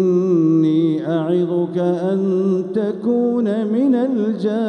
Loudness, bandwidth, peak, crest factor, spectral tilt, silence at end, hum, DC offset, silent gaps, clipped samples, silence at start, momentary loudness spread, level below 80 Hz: -18 LUFS; 8.6 kHz; -6 dBFS; 10 dB; -9.5 dB/octave; 0 s; none; under 0.1%; none; under 0.1%; 0 s; 4 LU; -72 dBFS